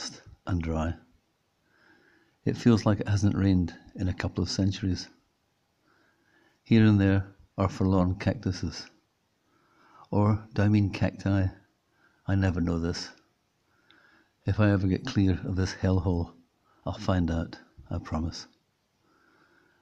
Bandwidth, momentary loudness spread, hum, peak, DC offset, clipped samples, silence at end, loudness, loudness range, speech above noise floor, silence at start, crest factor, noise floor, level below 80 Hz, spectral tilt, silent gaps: 8 kHz; 15 LU; none; -8 dBFS; under 0.1%; under 0.1%; 1.35 s; -28 LUFS; 5 LU; 47 dB; 0 s; 20 dB; -73 dBFS; -52 dBFS; -7 dB/octave; none